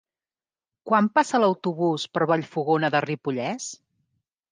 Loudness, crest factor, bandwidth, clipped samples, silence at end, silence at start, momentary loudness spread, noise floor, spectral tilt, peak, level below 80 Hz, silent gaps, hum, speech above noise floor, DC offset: -24 LUFS; 18 dB; 10 kHz; under 0.1%; 0.75 s; 0.85 s; 8 LU; under -90 dBFS; -5.5 dB/octave; -6 dBFS; -74 dBFS; none; none; over 67 dB; under 0.1%